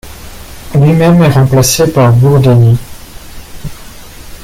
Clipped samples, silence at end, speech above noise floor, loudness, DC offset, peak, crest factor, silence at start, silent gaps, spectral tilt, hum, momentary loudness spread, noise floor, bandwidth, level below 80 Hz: under 0.1%; 0 s; 23 dB; -8 LUFS; under 0.1%; 0 dBFS; 10 dB; 0.05 s; none; -6 dB/octave; none; 23 LU; -29 dBFS; 16.5 kHz; -32 dBFS